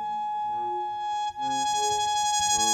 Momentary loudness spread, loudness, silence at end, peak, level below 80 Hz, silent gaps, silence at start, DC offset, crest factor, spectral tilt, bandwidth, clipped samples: 7 LU; -27 LUFS; 0 s; -12 dBFS; -60 dBFS; none; 0 s; under 0.1%; 14 dB; 0 dB/octave; 16 kHz; under 0.1%